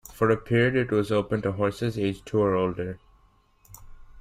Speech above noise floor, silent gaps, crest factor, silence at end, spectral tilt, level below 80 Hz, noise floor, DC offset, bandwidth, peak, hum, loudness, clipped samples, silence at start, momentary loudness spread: 36 dB; none; 18 dB; 0 s; -7 dB/octave; -52 dBFS; -61 dBFS; under 0.1%; 15.5 kHz; -10 dBFS; none; -25 LUFS; under 0.1%; 0.1 s; 8 LU